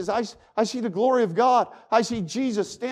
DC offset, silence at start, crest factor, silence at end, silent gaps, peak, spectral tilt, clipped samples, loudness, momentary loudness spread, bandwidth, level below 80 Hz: under 0.1%; 0 s; 16 dB; 0 s; none; -8 dBFS; -5 dB/octave; under 0.1%; -24 LUFS; 8 LU; 12 kHz; -62 dBFS